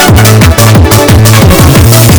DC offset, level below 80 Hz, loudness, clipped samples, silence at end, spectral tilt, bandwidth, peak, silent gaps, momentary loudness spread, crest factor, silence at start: under 0.1%; -16 dBFS; -2 LUFS; 60%; 0 s; -5 dB/octave; over 20 kHz; 0 dBFS; none; 1 LU; 2 dB; 0 s